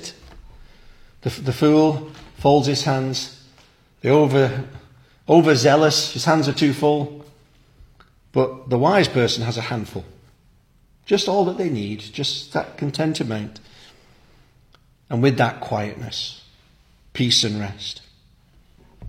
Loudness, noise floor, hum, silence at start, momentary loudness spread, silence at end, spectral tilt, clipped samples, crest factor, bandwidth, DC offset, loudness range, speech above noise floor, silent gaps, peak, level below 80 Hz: -20 LUFS; -56 dBFS; none; 0 s; 15 LU; 0 s; -5 dB/octave; under 0.1%; 20 dB; 16 kHz; under 0.1%; 7 LU; 37 dB; none; -2 dBFS; -52 dBFS